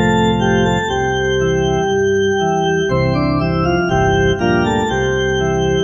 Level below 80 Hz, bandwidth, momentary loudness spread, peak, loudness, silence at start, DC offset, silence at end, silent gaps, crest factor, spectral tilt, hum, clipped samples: -30 dBFS; 7.4 kHz; 2 LU; -2 dBFS; -15 LUFS; 0 s; under 0.1%; 0 s; none; 12 dB; -6 dB/octave; none; under 0.1%